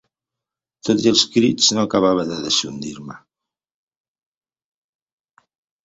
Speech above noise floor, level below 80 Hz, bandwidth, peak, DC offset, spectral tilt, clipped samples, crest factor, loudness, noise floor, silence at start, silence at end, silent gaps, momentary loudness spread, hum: 69 dB; -58 dBFS; 8.2 kHz; 0 dBFS; under 0.1%; -3.5 dB/octave; under 0.1%; 22 dB; -17 LUFS; -87 dBFS; 0.85 s; 2.65 s; none; 16 LU; none